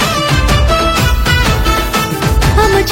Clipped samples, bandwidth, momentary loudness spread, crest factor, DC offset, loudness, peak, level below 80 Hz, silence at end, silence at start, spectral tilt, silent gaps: under 0.1%; 17 kHz; 3 LU; 10 dB; under 0.1%; -11 LUFS; 0 dBFS; -16 dBFS; 0 s; 0 s; -4.5 dB/octave; none